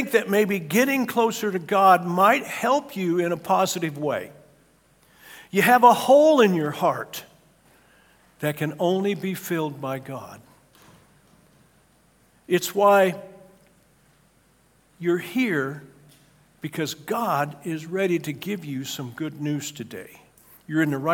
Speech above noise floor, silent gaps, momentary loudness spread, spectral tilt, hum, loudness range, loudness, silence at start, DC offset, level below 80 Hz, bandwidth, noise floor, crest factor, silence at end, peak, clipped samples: 38 dB; none; 16 LU; -5 dB/octave; none; 10 LU; -22 LUFS; 0 s; under 0.1%; -70 dBFS; 18 kHz; -60 dBFS; 22 dB; 0 s; -2 dBFS; under 0.1%